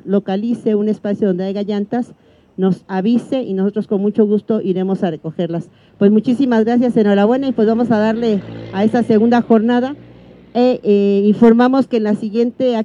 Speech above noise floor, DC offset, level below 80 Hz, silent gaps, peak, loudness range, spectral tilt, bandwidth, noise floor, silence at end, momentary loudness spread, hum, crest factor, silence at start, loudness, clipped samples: 26 dB; under 0.1%; -58 dBFS; none; 0 dBFS; 5 LU; -8.5 dB/octave; 7.2 kHz; -41 dBFS; 0 s; 9 LU; none; 14 dB; 0.05 s; -15 LUFS; under 0.1%